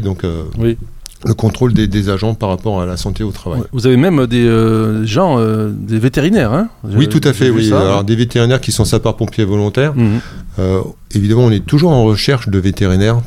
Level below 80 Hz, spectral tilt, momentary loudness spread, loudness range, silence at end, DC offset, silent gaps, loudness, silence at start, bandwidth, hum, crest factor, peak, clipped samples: -30 dBFS; -6.5 dB/octave; 9 LU; 3 LU; 0 s; under 0.1%; none; -13 LUFS; 0 s; 15.5 kHz; none; 12 dB; 0 dBFS; under 0.1%